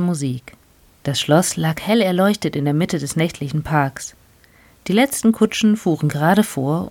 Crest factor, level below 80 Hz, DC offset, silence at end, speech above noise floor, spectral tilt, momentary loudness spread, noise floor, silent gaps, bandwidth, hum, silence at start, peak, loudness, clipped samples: 16 dB; -50 dBFS; under 0.1%; 0 s; 33 dB; -5.5 dB/octave; 9 LU; -51 dBFS; none; 17.5 kHz; none; 0 s; -2 dBFS; -18 LUFS; under 0.1%